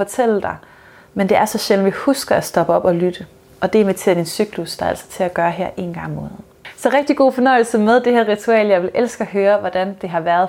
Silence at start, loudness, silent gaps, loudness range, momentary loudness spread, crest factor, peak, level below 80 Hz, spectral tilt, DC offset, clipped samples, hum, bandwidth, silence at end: 0 s; -17 LUFS; none; 5 LU; 12 LU; 14 dB; -2 dBFS; -52 dBFS; -5 dB/octave; under 0.1%; under 0.1%; none; 17.5 kHz; 0 s